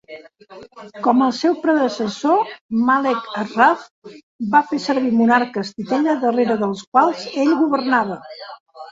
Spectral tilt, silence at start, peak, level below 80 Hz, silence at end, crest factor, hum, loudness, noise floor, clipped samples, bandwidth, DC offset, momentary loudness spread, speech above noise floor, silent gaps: -5.5 dB/octave; 0.1 s; -2 dBFS; -66 dBFS; 0 s; 18 dB; none; -18 LUFS; -40 dBFS; under 0.1%; 7.8 kHz; under 0.1%; 12 LU; 22 dB; 2.61-2.69 s, 3.91-4.02 s, 4.23-4.39 s, 6.87-6.92 s, 8.60-8.66 s